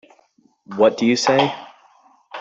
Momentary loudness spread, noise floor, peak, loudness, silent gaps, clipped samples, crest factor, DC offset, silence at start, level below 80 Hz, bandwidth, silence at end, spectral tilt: 19 LU; -59 dBFS; -2 dBFS; -17 LUFS; none; under 0.1%; 18 dB; under 0.1%; 0.7 s; -66 dBFS; 8.2 kHz; 0 s; -4.5 dB/octave